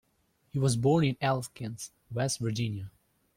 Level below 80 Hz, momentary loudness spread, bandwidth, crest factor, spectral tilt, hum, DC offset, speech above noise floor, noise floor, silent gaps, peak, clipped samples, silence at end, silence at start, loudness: -60 dBFS; 15 LU; 16 kHz; 18 dB; -5.5 dB/octave; none; under 0.1%; 42 dB; -72 dBFS; none; -14 dBFS; under 0.1%; 0.45 s; 0.55 s; -30 LUFS